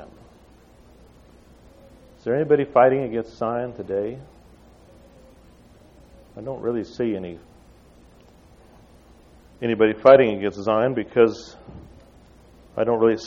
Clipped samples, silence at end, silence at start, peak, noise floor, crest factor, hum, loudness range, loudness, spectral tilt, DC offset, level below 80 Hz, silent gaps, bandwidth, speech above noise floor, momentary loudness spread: under 0.1%; 0 s; 0 s; -2 dBFS; -51 dBFS; 22 dB; none; 12 LU; -21 LUFS; -7 dB/octave; under 0.1%; -54 dBFS; none; 7.4 kHz; 31 dB; 22 LU